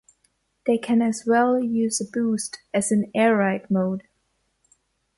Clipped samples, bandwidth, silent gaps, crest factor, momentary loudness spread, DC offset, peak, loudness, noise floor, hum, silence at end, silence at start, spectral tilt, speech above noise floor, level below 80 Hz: under 0.1%; 11.5 kHz; none; 16 dB; 8 LU; under 0.1%; -8 dBFS; -22 LUFS; -71 dBFS; none; 1.2 s; 0.65 s; -5 dB/octave; 49 dB; -66 dBFS